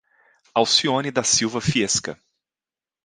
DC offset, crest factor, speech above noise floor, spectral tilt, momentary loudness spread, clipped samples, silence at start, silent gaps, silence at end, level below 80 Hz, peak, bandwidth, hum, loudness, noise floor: under 0.1%; 20 dB; over 69 dB; -2.5 dB/octave; 7 LU; under 0.1%; 0.55 s; none; 0.9 s; -54 dBFS; -4 dBFS; 11 kHz; none; -20 LUFS; under -90 dBFS